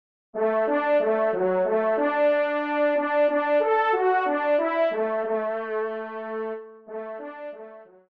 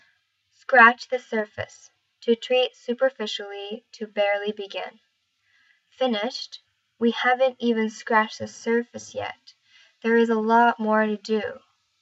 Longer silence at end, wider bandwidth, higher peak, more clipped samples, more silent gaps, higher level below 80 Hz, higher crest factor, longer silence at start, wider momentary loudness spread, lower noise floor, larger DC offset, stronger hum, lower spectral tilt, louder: second, 0.25 s vs 0.45 s; second, 5.2 kHz vs 8 kHz; second, -12 dBFS vs -2 dBFS; neither; neither; about the same, -78 dBFS vs -76 dBFS; second, 12 dB vs 22 dB; second, 0.35 s vs 0.7 s; about the same, 15 LU vs 16 LU; second, -45 dBFS vs -69 dBFS; neither; neither; first, -7.5 dB/octave vs -4 dB/octave; about the same, -24 LUFS vs -23 LUFS